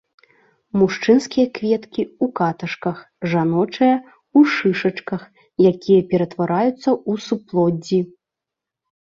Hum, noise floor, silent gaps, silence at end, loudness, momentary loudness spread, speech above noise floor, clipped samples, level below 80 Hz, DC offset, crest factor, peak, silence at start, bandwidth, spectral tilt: none; -85 dBFS; none; 1.1 s; -19 LUFS; 11 LU; 67 dB; under 0.1%; -60 dBFS; under 0.1%; 16 dB; -2 dBFS; 0.75 s; 7.8 kHz; -7 dB/octave